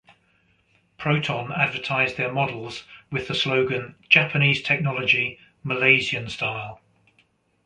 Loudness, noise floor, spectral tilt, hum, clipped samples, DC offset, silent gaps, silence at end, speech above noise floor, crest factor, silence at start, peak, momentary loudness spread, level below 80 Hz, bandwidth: -22 LUFS; -64 dBFS; -5.5 dB/octave; none; under 0.1%; under 0.1%; none; 0.9 s; 41 dB; 24 dB; 1 s; -2 dBFS; 14 LU; -60 dBFS; 9.8 kHz